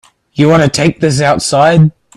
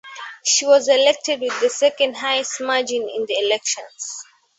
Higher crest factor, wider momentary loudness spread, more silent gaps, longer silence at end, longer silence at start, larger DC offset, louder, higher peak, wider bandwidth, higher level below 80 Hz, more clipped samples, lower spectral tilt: second, 10 dB vs 18 dB; second, 4 LU vs 15 LU; neither; about the same, 0.25 s vs 0.35 s; first, 0.35 s vs 0.05 s; neither; first, -10 LUFS vs -18 LUFS; about the same, 0 dBFS vs -2 dBFS; first, 12 kHz vs 8.4 kHz; first, -42 dBFS vs -72 dBFS; neither; first, -5.5 dB/octave vs 0.5 dB/octave